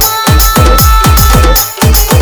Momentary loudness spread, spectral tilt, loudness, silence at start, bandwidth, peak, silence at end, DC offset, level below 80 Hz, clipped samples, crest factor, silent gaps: 2 LU; -4 dB/octave; -6 LUFS; 0 s; over 20 kHz; 0 dBFS; 0 s; under 0.1%; -8 dBFS; 1%; 6 dB; none